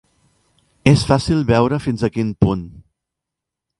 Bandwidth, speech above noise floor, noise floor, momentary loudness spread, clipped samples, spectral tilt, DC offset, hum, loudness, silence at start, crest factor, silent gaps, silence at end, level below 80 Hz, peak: 11.5 kHz; 67 dB; -83 dBFS; 6 LU; under 0.1%; -7 dB/octave; under 0.1%; none; -17 LUFS; 0.85 s; 18 dB; none; 1.1 s; -38 dBFS; 0 dBFS